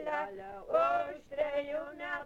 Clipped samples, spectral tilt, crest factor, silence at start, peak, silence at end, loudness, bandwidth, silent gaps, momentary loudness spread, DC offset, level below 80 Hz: under 0.1%; -5 dB/octave; 18 dB; 0 s; -18 dBFS; 0 s; -34 LUFS; 8.2 kHz; none; 10 LU; under 0.1%; -64 dBFS